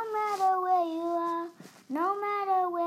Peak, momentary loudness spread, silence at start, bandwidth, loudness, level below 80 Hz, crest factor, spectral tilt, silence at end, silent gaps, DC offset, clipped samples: -16 dBFS; 8 LU; 0 s; 15 kHz; -29 LUFS; under -90 dBFS; 12 dB; -4.5 dB/octave; 0 s; none; under 0.1%; under 0.1%